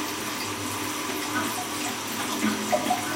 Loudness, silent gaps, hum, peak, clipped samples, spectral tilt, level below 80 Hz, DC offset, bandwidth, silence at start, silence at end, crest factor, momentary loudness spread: -28 LUFS; none; none; -12 dBFS; under 0.1%; -2.5 dB/octave; -62 dBFS; under 0.1%; 16 kHz; 0 s; 0 s; 16 dB; 4 LU